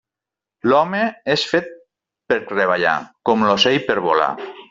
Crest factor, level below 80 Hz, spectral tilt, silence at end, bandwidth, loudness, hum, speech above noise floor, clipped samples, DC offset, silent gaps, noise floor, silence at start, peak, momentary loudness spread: 18 dB; -60 dBFS; -4.5 dB/octave; 0.05 s; 7.8 kHz; -18 LUFS; none; 69 dB; under 0.1%; under 0.1%; none; -87 dBFS; 0.65 s; -2 dBFS; 7 LU